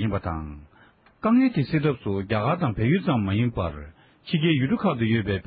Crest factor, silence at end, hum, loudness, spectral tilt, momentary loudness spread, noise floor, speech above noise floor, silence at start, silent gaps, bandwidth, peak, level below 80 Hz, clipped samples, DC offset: 14 dB; 0.05 s; none; -24 LUFS; -12 dB/octave; 11 LU; -56 dBFS; 33 dB; 0 s; none; 5 kHz; -10 dBFS; -44 dBFS; under 0.1%; under 0.1%